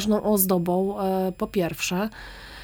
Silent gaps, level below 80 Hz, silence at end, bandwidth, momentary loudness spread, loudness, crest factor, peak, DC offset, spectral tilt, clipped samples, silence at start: none; -50 dBFS; 0 s; over 20 kHz; 11 LU; -24 LUFS; 18 dB; -6 dBFS; under 0.1%; -5 dB/octave; under 0.1%; 0 s